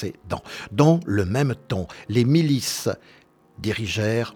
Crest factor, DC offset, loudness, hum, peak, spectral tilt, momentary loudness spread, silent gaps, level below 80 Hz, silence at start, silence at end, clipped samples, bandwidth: 20 dB; under 0.1%; -23 LUFS; none; -2 dBFS; -6 dB/octave; 13 LU; none; -50 dBFS; 0 s; 0.05 s; under 0.1%; 18.5 kHz